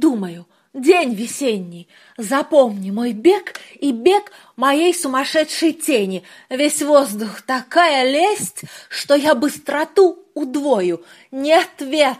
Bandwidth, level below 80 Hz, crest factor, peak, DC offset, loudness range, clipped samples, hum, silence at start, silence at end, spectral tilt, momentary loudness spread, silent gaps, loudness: 15.5 kHz; -70 dBFS; 16 dB; 0 dBFS; under 0.1%; 2 LU; under 0.1%; none; 0 s; 0.05 s; -3.5 dB/octave; 13 LU; none; -17 LUFS